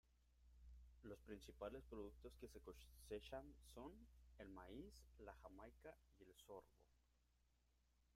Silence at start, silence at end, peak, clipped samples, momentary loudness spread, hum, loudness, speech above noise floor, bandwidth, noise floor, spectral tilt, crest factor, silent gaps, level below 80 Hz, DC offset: 0.05 s; 0 s; -40 dBFS; under 0.1%; 10 LU; 60 Hz at -70 dBFS; -60 LUFS; 23 dB; 16 kHz; -82 dBFS; -5.5 dB/octave; 20 dB; none; -68 dBFS; under 0.1%